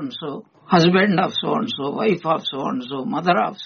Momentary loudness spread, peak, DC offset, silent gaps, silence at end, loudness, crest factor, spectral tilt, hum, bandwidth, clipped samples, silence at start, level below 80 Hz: 13 LU; -2 dBFS; under 0.1%; none; 0 s; -20 LUFS; 18 dB; -4 dB/octave; none; 6.8 kHz; under 0.1%; 0 s; -62 dBFS